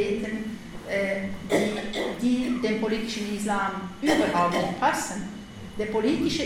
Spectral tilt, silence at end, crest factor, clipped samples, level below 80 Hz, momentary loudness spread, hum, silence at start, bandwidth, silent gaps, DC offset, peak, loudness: -4.5 dB/octave; 0 s; 18 dB; under 0.1%; -50 dBFS; 10 LU; none; 0 s; 17 kHz; none; under 0.1%; -8 dBFS; -26 LUFS